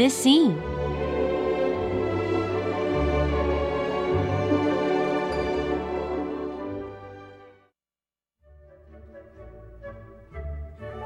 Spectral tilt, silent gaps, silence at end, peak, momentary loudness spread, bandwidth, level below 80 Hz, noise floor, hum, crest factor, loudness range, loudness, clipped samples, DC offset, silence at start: -5.5 dB/octave; none; 0 s; -8 dBFS; 19 LU; 14.5 kHz; -40 dBFS; under -90 dBFS; none; 18 dB; 19 LU; -25 LUFS; under 0.1%; under 0.1%; 0 s